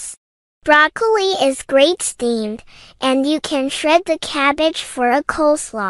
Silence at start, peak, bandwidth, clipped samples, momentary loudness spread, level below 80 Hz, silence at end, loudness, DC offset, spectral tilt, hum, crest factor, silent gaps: 0 s; 0 dBFS; 13.5 kHz; under 0.1%; 9 LU; -50 dBFS; 0 s; -16 LUFS; under 0.1%; -2 dB/octave; none; 16 dB; 0.17-0.61 s